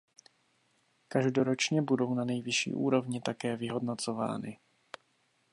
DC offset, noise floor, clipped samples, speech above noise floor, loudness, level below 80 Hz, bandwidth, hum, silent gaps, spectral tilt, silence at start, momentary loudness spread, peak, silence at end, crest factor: under 0.1%; -73 dBFS; under 0.1%; 42 dB; -31 LUFS; -76 dBFS; 11.5 kHz; none; none; -5 dB/octave; 1.1 s; 16 LU; -14 dBFS; 1 s; 20 dB